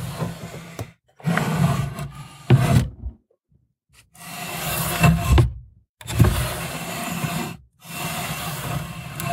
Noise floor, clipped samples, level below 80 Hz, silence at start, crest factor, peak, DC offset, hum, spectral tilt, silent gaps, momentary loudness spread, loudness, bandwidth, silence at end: -64 dBFS; under 0.1%; -32 dBFS; 0 s; 20 dB; -2 dBFS; under 0.1%; none; -5.5 dB/octave; 5.89-5.95 s; 19 LU; -23 LUFS; 16 kHz; 0 s